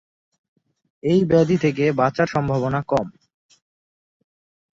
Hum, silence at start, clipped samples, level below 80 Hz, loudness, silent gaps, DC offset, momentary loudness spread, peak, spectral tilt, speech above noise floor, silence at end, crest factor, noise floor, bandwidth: none; 1.05 s; under 0.1%; -54 dBFS; -20 LUFS; none; under 0.1%; 7 LU; -4 dBFS; -7.5 dB/octave; over 71 dB; 1.65 s; 18 dB; under -90 dBFS; 7.8 kHz